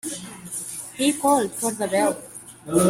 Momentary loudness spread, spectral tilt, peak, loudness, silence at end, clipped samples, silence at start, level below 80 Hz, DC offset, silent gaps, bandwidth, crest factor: 14 LU; -4 dB/octave; -6 dBFS; -24 LUFS; 0 s; under 0.1%; 0.05 s; -60 dBFS; under 0.1%; none; 16 kHz; 18 dB